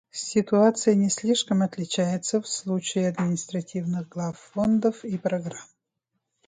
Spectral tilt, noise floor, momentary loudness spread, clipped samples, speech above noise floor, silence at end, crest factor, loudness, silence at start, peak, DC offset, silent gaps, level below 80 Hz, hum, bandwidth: -5 dB/octave; -80 dBFS; 11 LU; under 0.1%; 55 dB; 0.85 s; 18 dB; -25 LUFS; 0.15 s; -6 dBFS; under 0.1%; none; -64 dBFS; none; 9.6 kHz